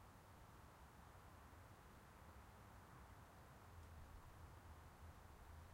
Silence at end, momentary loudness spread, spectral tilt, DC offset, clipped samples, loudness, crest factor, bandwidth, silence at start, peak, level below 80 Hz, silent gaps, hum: 0 s; 2 LU; -5 dB/octave; under 0.1%; under 0.1%; -64 LUFS; 14 dB; 16 kHz; 0 s; -50 dBFS; -68 dBFS; none; none